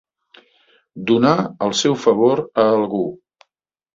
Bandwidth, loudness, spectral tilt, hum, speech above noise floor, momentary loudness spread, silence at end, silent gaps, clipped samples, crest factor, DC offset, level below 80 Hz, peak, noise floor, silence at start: 7.8 kHz; -17 LUFS; -5 dB/octave; none; 60 dB; 8 LU; 0.8 s; none; under 0.1%; 18 dB; under 0.1%; -60 dBFS; -2 dBFS; -76 dBFS; 0.95 s